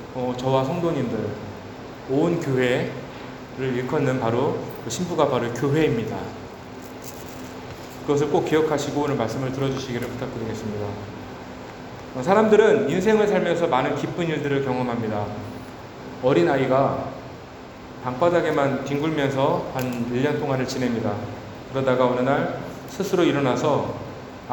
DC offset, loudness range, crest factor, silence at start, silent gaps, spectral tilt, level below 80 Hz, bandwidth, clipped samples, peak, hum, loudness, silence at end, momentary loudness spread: under 0.1%; 5 LU; 20 dB; 0 s; none; -6 dB/octave; -52 dBFS; over 20 kHz; under 0.1%; -4 dBFS; none; -23 LUFS; 0 s; 17 LU